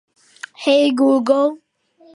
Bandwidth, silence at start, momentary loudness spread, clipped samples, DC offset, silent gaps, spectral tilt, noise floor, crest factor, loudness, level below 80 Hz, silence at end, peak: 11 kHz; 0.6 s; 18 LU; under 0.1%; under 0.1%; none; -4 dB/octave; -51 dBFS; 16 dB; -16 LUFS; -76 dBFS; 0.6 s; -2 dBFS